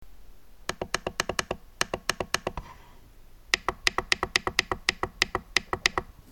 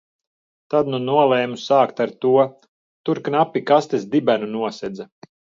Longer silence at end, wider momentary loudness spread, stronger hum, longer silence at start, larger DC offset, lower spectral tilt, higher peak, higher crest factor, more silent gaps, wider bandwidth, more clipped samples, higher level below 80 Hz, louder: second, 0.25 s vs 0.55 s; about the same, 11 LU vs 12 LU; neither; second, 0 s vs 0.7 s; neither; second, -1.5 dB/octave vs -6.5 dB/octave; about the same, -4 dBFS vs -2 dBFS; first, 28 dB vs 18 dB; second, none vs 2.68-3.04 s; first, 17.5 kHz vs 7.6 kHz; neither; first, -48 dBFS vs -68 dBFS; second, -28 LUFS vs -19 LUFS